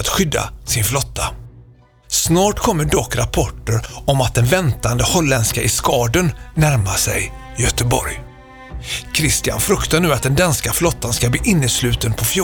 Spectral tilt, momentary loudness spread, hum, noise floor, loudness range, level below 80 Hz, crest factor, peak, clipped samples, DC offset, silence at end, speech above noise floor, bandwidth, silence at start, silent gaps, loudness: -4 dB/octave; 7 LU; none; -46 dBFS; 3 LU; -30 dBFS; 16 dB; 0 dBFS; under 0.1%; under 0.1%; 0 s; 29 dB; over 20 kHz; 0 s; none; -17 LUFS